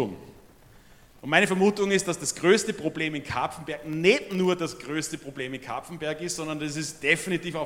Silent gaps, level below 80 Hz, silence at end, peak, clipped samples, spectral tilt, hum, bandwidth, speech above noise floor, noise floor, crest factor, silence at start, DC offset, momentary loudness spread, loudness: none; -60 dBFS; 0 s; -4 dBFS; under 0.1%; -4 dB/octave; none; 16.5 kHz; 27 dB; -53 dBFS; 24 dB; 0 s; under 0.1%; 12 LU; -26 LUFS